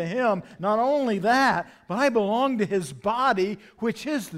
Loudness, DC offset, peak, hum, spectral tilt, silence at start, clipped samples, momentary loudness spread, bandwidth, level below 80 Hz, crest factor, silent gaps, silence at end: -24 LUFS; under 0.1%; -10 dBFS; none; -5.5 dB/octave; 0 s; under 0.1%; 9 LU; 16 kHz; -62 dBFS; 14 dB; none; 0 s